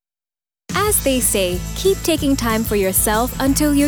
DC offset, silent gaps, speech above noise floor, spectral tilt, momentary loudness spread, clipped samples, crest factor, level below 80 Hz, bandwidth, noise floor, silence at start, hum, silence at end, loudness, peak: under 0.1%; none; over 73 dB; -3.5 dB/octave; 4 LU; under 0.1%; 14 dB; -30 dBFS; over 20 kHz; under -90 dBFS; 0.7 s; none; 0 s; -17 LUFS; -4 dBFS